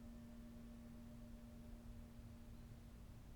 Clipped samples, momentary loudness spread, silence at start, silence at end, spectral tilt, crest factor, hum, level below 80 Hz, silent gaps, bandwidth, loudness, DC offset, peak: under 0.1%; 2 LU; 0 s; 0 s; -6.5 dB/octave; 12 dB; none; -60 dBFS; none; 19.5 kHz; -59 LUFS; under 0.1%; -44 dBFS